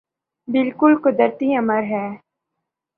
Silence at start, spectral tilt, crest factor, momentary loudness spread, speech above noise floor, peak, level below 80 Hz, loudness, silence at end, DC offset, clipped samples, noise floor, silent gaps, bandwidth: 0.5 s; -9.5 dB/octave; 18 dB; 11 LU; 63 dB; -2 dBFS; -68 dBFS; -18 LUFS; 0.8 s; under 0.1%; under 0.1%; -80 dBFS; none; 4.2 kHz